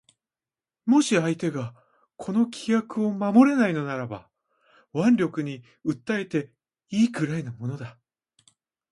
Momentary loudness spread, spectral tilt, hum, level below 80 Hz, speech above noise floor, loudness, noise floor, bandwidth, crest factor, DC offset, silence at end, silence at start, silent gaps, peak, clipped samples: 15 LU; -6 dB/octave; none; -68 dBFS; over 66 dB; -25 LUFS; under -90 dBFS; 11.5 kHz; 20 dB; under 0.1%; 1 s; 0.85 s; none; -6 dBFS; under 0.1%